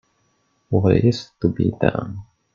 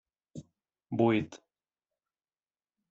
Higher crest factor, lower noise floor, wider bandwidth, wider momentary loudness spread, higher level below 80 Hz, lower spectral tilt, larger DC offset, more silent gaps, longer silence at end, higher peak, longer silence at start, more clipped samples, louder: about the same, 20 dB vs 22 dB; second, -66 dBFS vs under -90 dBFS; about the same, 7.4 kHz vs 7.8 kHz; second, 14 LU vs 23 LU; first, -48 dBFS vs -74 dBFS; first, -8 dB/octave vs -6.5 dB/octave; neither; neither; second, 0.3 s vs 1.55 s; first, 0 dBFS vs -14 dBFS; first, 0.7 s vs 0.35 s; neither; first, -20 LUFS vs -30 LUFS